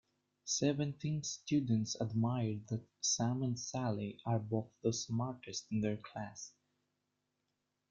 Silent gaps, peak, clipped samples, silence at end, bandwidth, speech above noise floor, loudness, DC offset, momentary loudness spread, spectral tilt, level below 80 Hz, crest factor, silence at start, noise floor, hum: none; -20 dBFS; under 0.1%; 1.4 s; 7.8 kHz; 48 dB; -37 LUFS; under 0.1%; 10 LU; -5 dB/octave; -72 dBFS; 18 dB; 0.45 s; -85 dBFS; 50 Hz at -65 dBFS